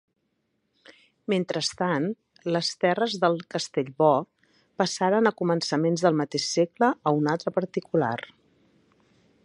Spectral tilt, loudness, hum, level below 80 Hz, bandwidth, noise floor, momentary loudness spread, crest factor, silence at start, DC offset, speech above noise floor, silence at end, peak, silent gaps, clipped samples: -5 dB/octave; -25 LUFS; none; -72 dBFS; 11.5 kHz; -75 dBFS; 7 LU; 20 dB; 1.3 s; under 0.1%; 50 dB; 1.2 s; -6 dBFS; none; under 0.1%